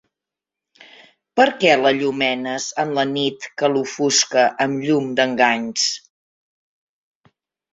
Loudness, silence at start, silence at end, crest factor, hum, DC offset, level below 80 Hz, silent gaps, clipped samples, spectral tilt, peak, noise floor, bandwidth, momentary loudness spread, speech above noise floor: -18 LUFS; 1.35 s; 1.75 s; 20 dB; none; under 0.1%; -66 dBFS; none; under 0.1%; -2.5 dB/octave; -2 dBFS; -86 dBFS; 8.2 kHz; 8 LU; 68 dB